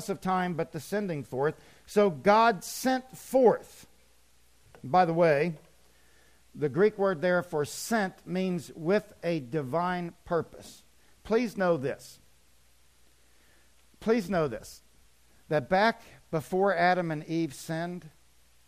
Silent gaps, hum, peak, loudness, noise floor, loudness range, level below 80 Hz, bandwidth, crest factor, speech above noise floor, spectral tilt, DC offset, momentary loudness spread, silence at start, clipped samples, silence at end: none; none; -10 dBFS; -28 LUFS; -65 dBFS; 7 LU; -62 dBFS; 15.5 kHz; 20 dB; 37 dB; -5.5 dB/octave; under 0.1%; 12 LU; 0 s; under 0.1%; 0.6 s